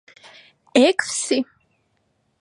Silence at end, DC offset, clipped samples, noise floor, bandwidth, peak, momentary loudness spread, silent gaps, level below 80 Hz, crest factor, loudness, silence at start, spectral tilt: 1 s; under 0.1%; under 0.1%; -68 dBFS; 11.5 kHz; -2 dBFS; 8 LU; none; -72 dBFS; 22 dB; -19 LUFS; 0.75 s; -1.5 dB/octave